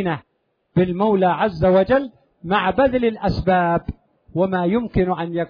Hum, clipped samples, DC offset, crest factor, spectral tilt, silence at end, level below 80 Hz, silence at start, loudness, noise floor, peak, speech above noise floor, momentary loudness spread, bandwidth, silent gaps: none; under 0.1%; under 0.1%; 14 dB; -9.5 dB/octave; 0.05 s; -40 dBFS; 0 s; -19 LUFS; -66 dBFS; -4 dBFS; 48 dB; 10 LU; 5.2 kHz; none